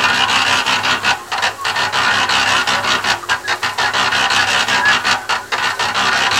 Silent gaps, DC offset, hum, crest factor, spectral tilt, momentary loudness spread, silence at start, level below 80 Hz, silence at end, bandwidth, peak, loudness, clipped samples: none; 0.2%; none; 16 dB; -0.5 dB/octave; 5 LU; 0 s; -48 dBFS; 0 s; 17 kHz; 0 dBFS; -14 LUFS; under 0.1%